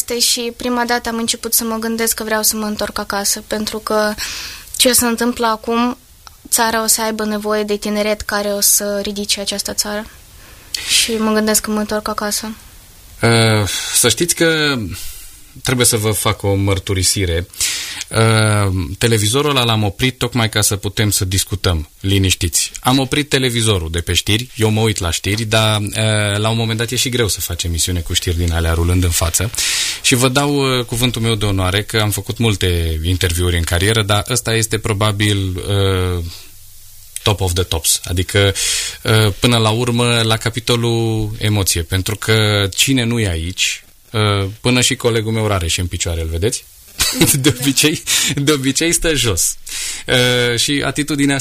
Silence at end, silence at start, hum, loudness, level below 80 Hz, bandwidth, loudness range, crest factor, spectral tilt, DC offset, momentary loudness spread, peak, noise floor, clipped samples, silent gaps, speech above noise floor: 0 s; 0 s; none; -15 LUFS; -34 dBFS; 15.5 kHz; 2 LU; 16 dB; -3.5 dB/octave; under 0.1%; 7 LU; 0 dBFS; -40 dBFS; under 0.1%; none; 24 dB